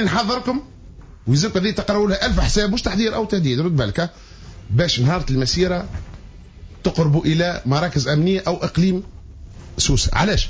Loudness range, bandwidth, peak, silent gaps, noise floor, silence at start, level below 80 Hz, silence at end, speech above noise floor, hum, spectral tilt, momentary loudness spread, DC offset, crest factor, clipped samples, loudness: 1 LU; 8 kHz; -4 dBFS; none; -40 dBFS; 0 s; -30 dBFS; 0 s; 22 dB; none; -5 dB/octave; 10 LU; under 0.1%; 14 dB; under 0.1%; -19 LUFS